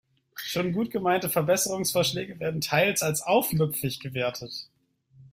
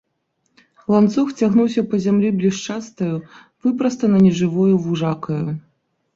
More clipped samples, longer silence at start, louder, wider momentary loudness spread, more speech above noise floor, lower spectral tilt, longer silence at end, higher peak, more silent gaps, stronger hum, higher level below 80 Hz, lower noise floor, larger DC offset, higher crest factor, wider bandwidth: neither; second, 0.35 s vs 0.9 s; second, -26 LUFS vs -18 LUFS; about the same, 11 LU vs 11 LU; second, 33 dB vs 52 dB; second, -4 dB/octave vs -7.5 dB/octave; second, 0.1 s vs 0.55 s; second, -8 dBFS vs -2 dBFS; neither; neither; about the same, -60 dBFS vs -58 dBFS; second, -59 dBFS vs -70 dBFS; neither; about the same, 18 dB vs 16 dB; first, 16 kHz vs 7.6 kHz